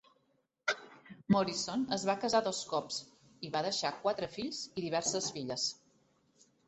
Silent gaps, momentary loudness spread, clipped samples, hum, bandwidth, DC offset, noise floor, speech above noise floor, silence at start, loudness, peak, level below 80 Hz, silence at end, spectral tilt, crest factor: none; 10 LU; under 0.1%; none; 8.2 kHz; under 0.1%; -77 dBFS; 42 dB; 0.65 s; -35 LUFS; -16 dBFS; -72 dBFS; 0.95 s; -3.5 dB/octave; 20 dB